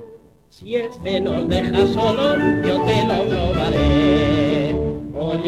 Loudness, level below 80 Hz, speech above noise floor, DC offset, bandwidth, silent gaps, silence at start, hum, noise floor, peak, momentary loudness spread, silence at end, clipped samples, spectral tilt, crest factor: -19 LUFS; -34 dBFS; 25 dB; under 0.1%; 12 kHz; none; 0 s; none; -43 dBFS; -4 dBFS; 8 LU; 0 s; under 0.1%; -7 dB/octave; 16 dB